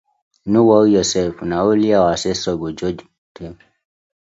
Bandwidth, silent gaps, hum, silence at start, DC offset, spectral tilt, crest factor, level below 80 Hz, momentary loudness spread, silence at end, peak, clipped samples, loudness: 8 kHz; 3.18-3.35 s; none; 0.45 s; under 0.1%; -5 dB/octave; 18 dB; -46 dBFS; 23 LU; 0.8 s; 0 dBFS; under 0.1%; -16 LUFS